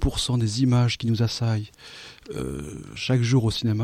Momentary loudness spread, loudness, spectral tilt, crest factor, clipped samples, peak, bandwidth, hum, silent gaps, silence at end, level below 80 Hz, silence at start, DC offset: 17 LU; -24 LUFS; -6 dB/octave; 14 dB; under 0.1%; -10 dBFS; 13 kHz; none; none; 0 s; -38 dBFS; 0 s; under 0.1%